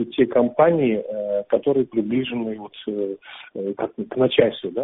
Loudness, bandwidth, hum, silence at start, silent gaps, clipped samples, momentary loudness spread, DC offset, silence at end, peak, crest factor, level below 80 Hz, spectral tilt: -22 LUFS; 4 kHz; none; 0 s; none; under 0.1%; 13 LU; under 0.1%; 0 s; -2 dBFS; 20 dB; -60 dBFS; -5 dB/octave